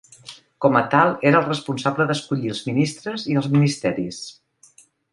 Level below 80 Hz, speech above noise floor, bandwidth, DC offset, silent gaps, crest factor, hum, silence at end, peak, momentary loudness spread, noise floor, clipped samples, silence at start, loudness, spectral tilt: -60 dBFS; 34 dB; 11.5 kHz; under 0.1%; none; 20 dB; none; 0.8 s; -2 dBFS; 17 LU; -54 dBFS; under 0.1%; 0.25 s; -20 LUFS; -6 dB/octave